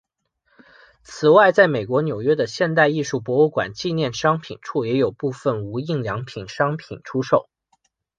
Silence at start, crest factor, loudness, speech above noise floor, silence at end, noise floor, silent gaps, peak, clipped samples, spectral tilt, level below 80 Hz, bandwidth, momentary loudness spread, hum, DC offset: 1.1 s; 20 dB; -20 LUFS; 48 dB; 0.8 s; -68 dBFS; none; -2 dBFS; under 0.1%; -6 dB/octave; -58 dBFS; 9.2 kHz; 12 LU; none; under 0.1%